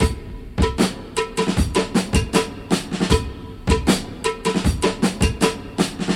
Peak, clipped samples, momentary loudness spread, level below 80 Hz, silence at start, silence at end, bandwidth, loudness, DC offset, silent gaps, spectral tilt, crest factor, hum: -2 dBFS; under 0.1%; 5 LU; -28 dBFS; 0 s; 0 s; 16.5 kHz; -21 LUFS; under 0.1%; none; -5 dB/octave; 18 dB; none